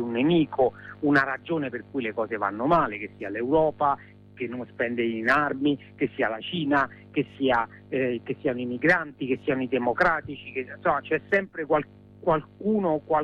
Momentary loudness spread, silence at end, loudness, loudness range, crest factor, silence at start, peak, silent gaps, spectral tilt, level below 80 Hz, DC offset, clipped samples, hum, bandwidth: 9 LU; 0 s; -26 LUFS; 1 LU; 16 dB; 0 s; -10 dBFS; none; -7.5 dB/octave; -56 dBFS; under 0.1%; under 0.1%; none; 8 kHz